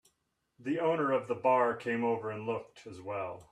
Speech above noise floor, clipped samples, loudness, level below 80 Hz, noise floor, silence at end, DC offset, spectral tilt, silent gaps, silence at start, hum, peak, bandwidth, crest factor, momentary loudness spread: 47 dB; under 0.1%; -32 LUFS; -76 dBFS; -79 dBFS; 0.1 s; under 0.1%; -7 dB/octave; none; 0.6 s; none; -16 dBFS; 10.5 kHz; 18 dB; 13 LU